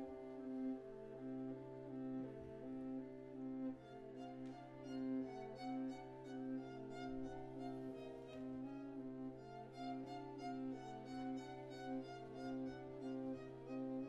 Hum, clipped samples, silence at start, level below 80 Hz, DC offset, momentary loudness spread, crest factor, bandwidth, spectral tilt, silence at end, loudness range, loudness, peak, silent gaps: none; under 0.1%; 0 s; -72 dBFS; under 0.1%; 6 LU; 12 dB; 9 kHz; -7.5 dB/octave; 0 s; 2 LU; -50 LUFS; -36 dBFS; none